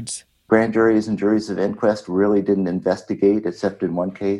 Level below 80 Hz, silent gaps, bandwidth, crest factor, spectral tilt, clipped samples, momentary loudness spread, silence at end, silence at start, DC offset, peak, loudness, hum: -56 dBFS; none; 11.5 kHz; 18 dB; -6.5 dB/octave; under 0.1%; 7 LU; 0 s; 0 s; under 0.1%; -2 dBFS; -20 LUFS; none